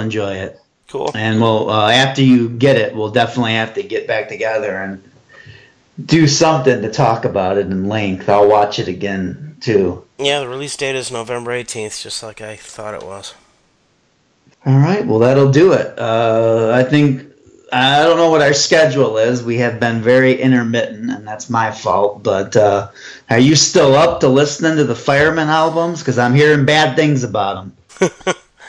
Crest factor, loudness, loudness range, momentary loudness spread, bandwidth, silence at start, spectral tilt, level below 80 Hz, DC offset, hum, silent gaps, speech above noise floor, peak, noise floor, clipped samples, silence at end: 14 dB; -14 LUFS; 7 LU; 14 LU; 10.5 kHz; 0 s; -5 dB/octave; -52 dBFS; under 0.1%; none; none; 44 dB; 0 dBFS; -58 dBFS; under 0.1%; 0 s